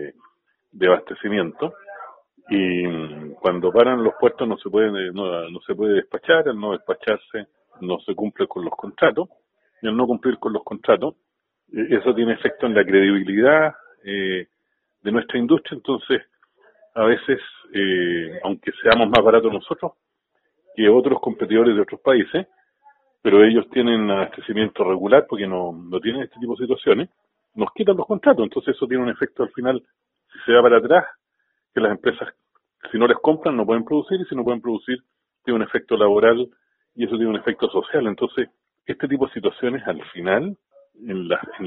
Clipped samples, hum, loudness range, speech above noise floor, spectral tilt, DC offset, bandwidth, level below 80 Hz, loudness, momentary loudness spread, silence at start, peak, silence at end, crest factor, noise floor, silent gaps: under 0.1%; none; 5 LU; 54 dB; -3.5 dB/octave; under 0.1%; 4.5 kHz; -60 dBFS; -20 LUFS; 14 LU; 0 s; 0 dBFS; 0 s; 20 dB; -74 dBFS; none